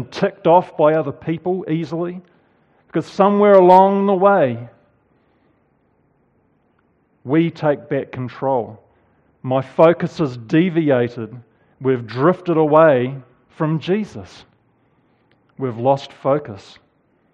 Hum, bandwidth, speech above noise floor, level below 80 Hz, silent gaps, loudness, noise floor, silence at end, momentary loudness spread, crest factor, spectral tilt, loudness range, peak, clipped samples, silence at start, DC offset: none; 8 kHz; 44 dB; -64 dBFS; none; -17 LUFS; -61 dBFS; 0.75 s; 17 LU; 18 dB; -8.5 dB/octave; 9 LU; 0 dBFS; under 0.1%; 0 s; under 0.1%